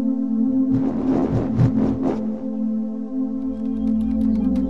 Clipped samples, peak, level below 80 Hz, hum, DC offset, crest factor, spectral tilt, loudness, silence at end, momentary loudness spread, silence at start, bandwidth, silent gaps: under 0.1%; -6 dBFS; -38 dBFS; none; 1%; 14 dB; -10.5 dB/octave; -21 LUFS; 0 s; 6 LU; 0 s; 5.8 kHz; none